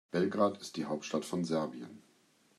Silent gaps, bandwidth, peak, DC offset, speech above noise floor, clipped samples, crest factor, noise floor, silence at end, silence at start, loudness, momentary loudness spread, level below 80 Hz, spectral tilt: none; 14 kHz; -16 dBFS; under 0.1%; 34 dB; under 0.1%; 18 dB; -68 dBFS; 0.6 s; 0.15 s; -35 LUFS; 12 LU; -78 dBFS; -5.5 dB/octave